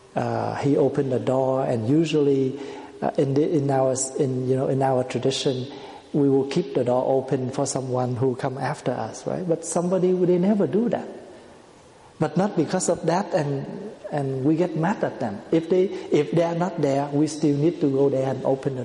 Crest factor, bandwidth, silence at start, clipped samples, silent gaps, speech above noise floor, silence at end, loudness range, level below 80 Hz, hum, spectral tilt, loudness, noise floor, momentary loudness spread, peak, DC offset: 16 dB; 11.5 kHz; 0.15 s; under 0.1%; none; 27 dB; 0 s; 2 LU; -62 dBFS; none; -6.5 dB/octave; -23 LUFS; -49 dBFS; 8 LU; -8 dBFS; under 0.1%